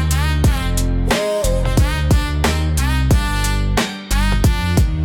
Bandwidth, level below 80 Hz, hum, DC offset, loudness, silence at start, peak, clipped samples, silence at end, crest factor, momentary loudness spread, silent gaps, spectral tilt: 18 kHz; -18 dBFS; none; under 0.1%; -18 LUFS; 0 s; -4 dBFS; under 0.1%; 0 s; 12 dB; 3 LU; none; -5 dB/octave